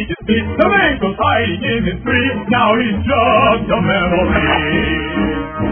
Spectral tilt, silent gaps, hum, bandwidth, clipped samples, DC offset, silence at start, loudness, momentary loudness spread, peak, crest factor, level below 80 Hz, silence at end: -9.5 dB/octave; none; none; 3.5 kHz; under 0.1%; under 0.1%; 0 s; -14 LUFS; 6 LU; 0 dBFS; 14 dB; -30 dBFS; 0 s